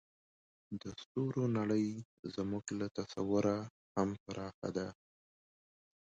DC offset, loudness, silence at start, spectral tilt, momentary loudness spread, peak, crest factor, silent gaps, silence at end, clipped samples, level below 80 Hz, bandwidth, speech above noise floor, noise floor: under 0.1%; -38 LUFS; 0.7 s; -6.5 dB/octave; 12 LU; -20 dBFS; 18 dB; 1.06-1.15 s, 2.05-2.23 s, 3.70-3.95 s, 4.20-4.26 s, 4.54-4.62 s; 1.1 s; under 0.1%; -68 dBFS; 9 kHz; over 53 dB; under -90 dBFS